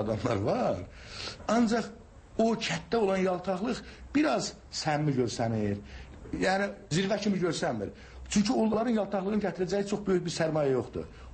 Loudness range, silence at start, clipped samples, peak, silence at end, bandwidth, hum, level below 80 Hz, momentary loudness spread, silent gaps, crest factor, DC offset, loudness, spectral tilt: 1 LU; 0 s; under 0.1%; -16 dBFS; 0 s; 8.8 kHz; none; -52 dBFS; 12 LU; none; 14 dB; under 0.1%; -30 LUFS; -5.5 dB/octave